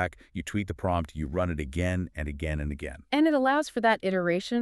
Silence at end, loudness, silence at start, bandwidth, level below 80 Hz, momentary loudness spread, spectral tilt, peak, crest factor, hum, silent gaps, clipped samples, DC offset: 0 s; -28 LUFS; 0 s; 12.5 kHz; -42 dBFS; 9 LU; -6.5 dB/octave; -10 dBFS; 18 dB; none; none; under 0.1%; under 0.1%